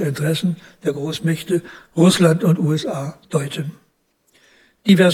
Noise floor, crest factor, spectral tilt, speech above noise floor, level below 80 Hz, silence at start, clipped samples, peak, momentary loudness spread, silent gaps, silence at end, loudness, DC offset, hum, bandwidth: -64 dBFS; 18 dB; -6 dB/octave; 46 dB; -60 dBFS; 0 s; under 0.1%; -2 dBFS; 13 LU; none; 0 s; -19 LUFS; under 0.1%; none; 15.5 kHz